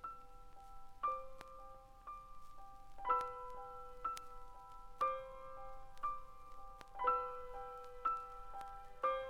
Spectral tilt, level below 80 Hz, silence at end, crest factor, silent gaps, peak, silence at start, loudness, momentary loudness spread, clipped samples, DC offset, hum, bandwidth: -4 dB/octave; -60 dBFS; 0 s; 22 dB; none; -22 dBFS; 0 s; -44 LUFS; 20 LU; under 0.1%; under 0.1%; none; 16 kHz